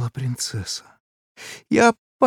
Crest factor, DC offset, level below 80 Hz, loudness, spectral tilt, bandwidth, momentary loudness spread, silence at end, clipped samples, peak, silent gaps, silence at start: 20 dB; under 0.1%; -58 dBFS; -22 LUFS; -4.5 dB/octave; 17.5 kHz; 21 LU; 0 s; under 0.1%; -2 dBFS; 1.00-1.35 s, 1.98-2.19 s; 0 s